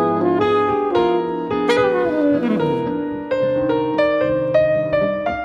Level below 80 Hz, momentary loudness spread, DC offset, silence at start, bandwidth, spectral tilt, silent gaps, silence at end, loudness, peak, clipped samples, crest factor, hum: -48 dBFS; 4 LU; under 0.1%; 0 s; 10 kHz; -7 dB/octave; none; 0 s; -18 LUFS; -6 dBFS; under 0.1%; 12 dB; none